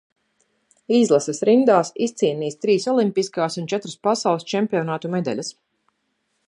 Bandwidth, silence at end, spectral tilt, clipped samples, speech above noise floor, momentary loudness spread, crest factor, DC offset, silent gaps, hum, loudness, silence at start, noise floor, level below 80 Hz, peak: 11 kHz; 0.95 s; -5 dB/octave; under 0.1%; 52 dB; 8 LU; 18 dB; under 0.1%; none; none; -21 LUFS; 0.9 s; -72 dBFS; -72 dBFS; -2 dBFS